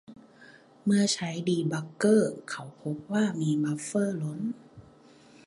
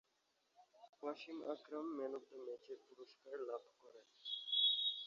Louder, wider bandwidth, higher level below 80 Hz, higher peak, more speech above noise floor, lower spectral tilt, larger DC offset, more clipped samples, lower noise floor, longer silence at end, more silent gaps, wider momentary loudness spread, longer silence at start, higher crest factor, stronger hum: first, -28 LUFS vs -42 LUFS; first, 11.5 kHz vs 7.4 kHz; first, -70 dBFS vs under -90 dBFS; first, -10 dBFS vs -26 dBFS; second, 28 dB vs 33 dB; first, -5.5 dB/octave vs 1.5 dB/octave; neither; neither; second, -55 dBFS vs -83 dBFS; first, 0.65 s vs 0 s; second, none vs 0.89-0.93 s; second, 13 LU vs 20 LU; second, 0.1 s vs 0.6 s; about the same, 18 dB vs 20 dB; neither